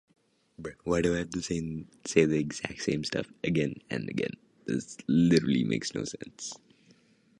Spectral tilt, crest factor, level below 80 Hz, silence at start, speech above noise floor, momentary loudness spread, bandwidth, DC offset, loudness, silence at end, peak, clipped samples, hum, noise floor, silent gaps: -5.5 dB/octave; 22 dB; -56 dBFS; 0.6 s; 33 dB; 15 LU; 11.5 kHz; under 0.1%; -30 LUFS; 0.85 s; -8 dBFS; under 0.1%; none; -63 dBFS; none